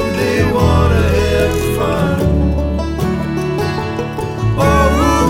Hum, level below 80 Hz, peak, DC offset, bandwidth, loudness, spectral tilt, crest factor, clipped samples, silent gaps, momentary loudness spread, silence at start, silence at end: none; -22 dBFS; 0 dBFS; under 0.1%; 16.5 kHz; -15 LUFS; -6.5 dB/octave; 12 dB; under 0.1%; none; 7 LU; 0 s; 0 s